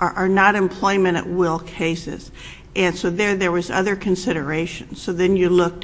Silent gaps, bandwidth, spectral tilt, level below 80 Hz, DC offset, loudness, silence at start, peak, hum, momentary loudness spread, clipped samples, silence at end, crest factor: none; 8 kHz; -5.5 dB/octave; -44 dBFS; under 0.1%; -20 LUFS; 0 s; 0 dBFS; none; 12 LU; under 0.1%; 0 s; 20 dB